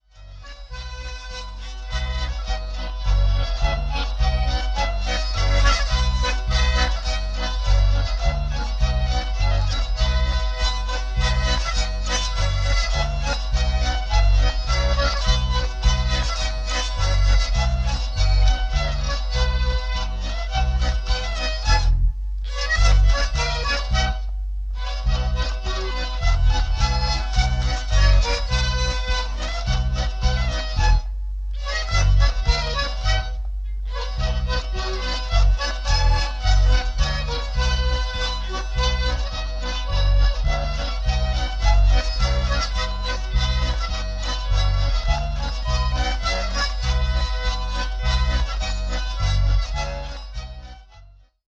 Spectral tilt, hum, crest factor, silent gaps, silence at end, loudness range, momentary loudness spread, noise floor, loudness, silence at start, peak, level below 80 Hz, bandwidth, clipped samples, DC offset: -4 dB/octave; none; 16 dB; none; 0.4 s; 3 LU; 8 LU; -48 dBFS; -23 LUFS; 0.15 s; -6 dBFS; -22 dBFS; 8 kHz; under 0.1%; under 0.1%